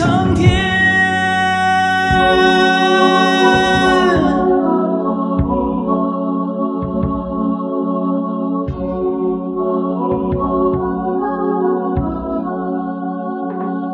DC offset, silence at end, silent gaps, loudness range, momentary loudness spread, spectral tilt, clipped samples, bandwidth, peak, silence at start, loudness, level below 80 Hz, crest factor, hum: under 0.1%; 0 s; none; 7 LU; 9 LU; -6 dB/octave; under 0.1%; 11 kHz; 0 dBFS; 0 s; -15 LUFS; -34 dBFS; 16 dB; none